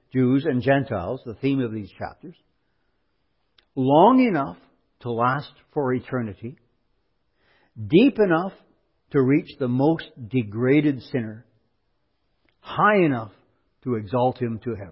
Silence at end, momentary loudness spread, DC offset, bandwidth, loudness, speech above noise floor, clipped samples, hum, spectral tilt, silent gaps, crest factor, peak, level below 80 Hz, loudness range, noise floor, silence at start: 0 s; 17 LU; under 0.1%; 5.8 kHz; -22 LUFS; 51 dB; under 0.1%; none; -12 dB/octave; none; 20 dB; -4 dBFS; -56 dBFS; 5 LU; -73 dBFS; 0.15 s